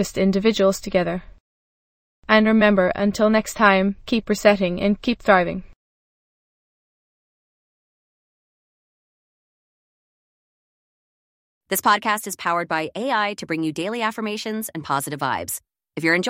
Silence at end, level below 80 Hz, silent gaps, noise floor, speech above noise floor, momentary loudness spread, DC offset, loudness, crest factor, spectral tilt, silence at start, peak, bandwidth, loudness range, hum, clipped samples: 0 s; -50 dBFS; 1.40-2.23 s, 5.76-11.61 s; under -90 dBFS; over 70 dB; 11 LU; under 0.1%; -20 LUFS; 22 dB; -4.5 dB/octave; 0 s; -2 dBFS; 16 kHz; 8 LU; none; under 0.1%